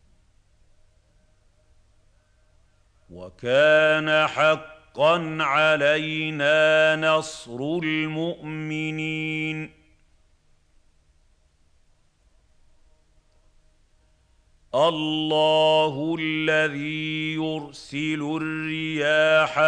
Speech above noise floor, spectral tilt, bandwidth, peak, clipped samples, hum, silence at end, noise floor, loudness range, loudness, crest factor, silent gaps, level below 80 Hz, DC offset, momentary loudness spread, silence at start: 39 dB; -5 dB/octave; 10 kHz; -6 dBFS; under 0.1%; none; 0 s; -61 dBFS; 11 LU; -22 LUFS; 18 dB; none; -60 dBFS; under 0.1%; 12 LU; 3.1 s